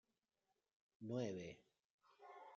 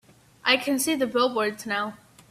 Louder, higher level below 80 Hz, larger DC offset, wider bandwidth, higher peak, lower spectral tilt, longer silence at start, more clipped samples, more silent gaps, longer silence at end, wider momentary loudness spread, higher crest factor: second, -49 LUFS vs -25 LUFS; second, -88 dBFS vs -68 dBFS; neither; second, 7.2 kHz vs 16 kHz; second, -32 dBFS vs -4 dBFS; first, -6.5 dB/octave vs -2 dB/octave; first, 1 s vs 0.45 s; neither; first, 1.84-1.99 s vs none; second, 0 s vs 0.35 s; first, 19 LU vs 7 LU; about the same, 22 dB vs 22 dB